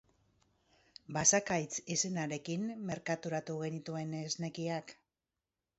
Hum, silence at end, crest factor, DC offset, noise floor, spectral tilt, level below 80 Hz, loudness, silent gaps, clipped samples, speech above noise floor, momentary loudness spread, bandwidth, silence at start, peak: none; 0.85 s; 24 dB; under 0.1%; under -90 dBFS; -4.5 dB/octave; -72 dBFS; -35 LUFS; none; under 0.1%; over 54 dB; 12 LU; 8 kHz; 1.1 s; -14 dBFS